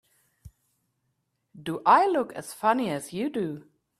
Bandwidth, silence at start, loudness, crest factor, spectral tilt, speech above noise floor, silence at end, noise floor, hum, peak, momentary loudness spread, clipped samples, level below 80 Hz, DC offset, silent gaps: 15 kHz; 0.45 s; -26 LUFS; 22 dB; -5 dB/octave; 51 dB; 0.4 s; -77 dBFS; none; -6 dBFS; 15 LU; under 0.1%; -66 dBFS; under 0.1%; none